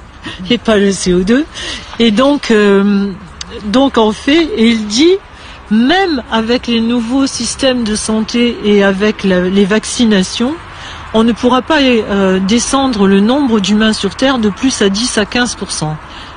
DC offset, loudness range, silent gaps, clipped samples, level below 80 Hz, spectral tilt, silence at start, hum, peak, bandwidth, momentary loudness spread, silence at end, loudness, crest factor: under 0.1%; 2 LU; none; under 0.1%; -36 dBFS; -4.5 dB/octave; 0 s; none; 0 dBFS; 10 kHz; 9 LU; 0 s; -12 LUFS; 12 dB